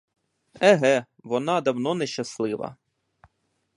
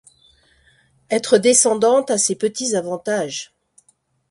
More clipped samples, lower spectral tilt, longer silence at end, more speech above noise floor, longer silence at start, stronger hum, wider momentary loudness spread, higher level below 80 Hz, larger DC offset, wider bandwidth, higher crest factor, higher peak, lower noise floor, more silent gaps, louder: neither; first, -5 dB/octave vs -2.5 dB/octave; first, 1.05 s vs 0.85 s; first, 49 dB vs 44 dB; second, 0.55 s vs 1.1 s; neither; about the same, 11 LU vs 12 LU; second, -70 dBFS vs -64 dBFS; neither; about the same, 11.5 kHz vs 11.5 kHz; about the same, 22 dB vs 18 dB; about the same, -4 dBFS vs -2 dBFS; first, -72 dBFS vs -62 dBFS; neither; second, -24 LUFS vs -17 LUFS